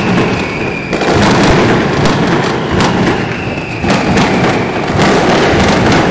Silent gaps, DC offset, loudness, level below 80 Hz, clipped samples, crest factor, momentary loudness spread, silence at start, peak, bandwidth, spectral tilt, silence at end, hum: none; under 0.1%; -11 LUFS; -28 dBFS; under 0.1%; 10 dB; 7 LU; 0 s; 0 dBFS; 8 kHz; -5.5 dB/octave; 0 s; none